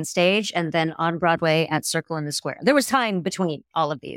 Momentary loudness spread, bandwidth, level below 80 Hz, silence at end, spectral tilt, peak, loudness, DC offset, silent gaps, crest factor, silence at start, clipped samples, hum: 7 LU; 16.5 kHz; -66 dBFS; 0 s; -4.5 dB/octave; -6 dBFS; -22 LUFS; under 0.1%; none; 16 dB; 0 s; under 0.1%; none